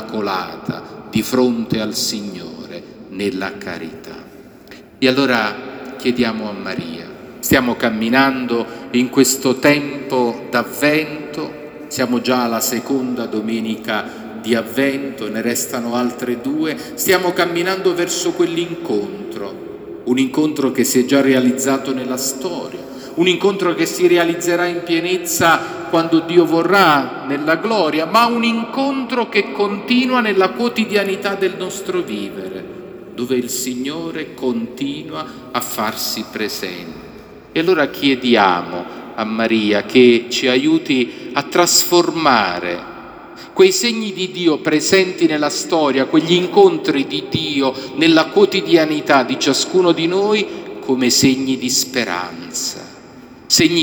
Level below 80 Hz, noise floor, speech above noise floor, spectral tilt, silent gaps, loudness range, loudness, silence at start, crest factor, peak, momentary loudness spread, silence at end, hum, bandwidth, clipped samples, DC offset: -56 dBFS; -40 dBFS; 24 dB; -3.5 dB/octave; none; 7 LU; -16 LUFS; 0 s; 18 dB; 0 dBFS; 15 LU; 0 s; none; over 20 kHz; under 0.1%; under 0.1%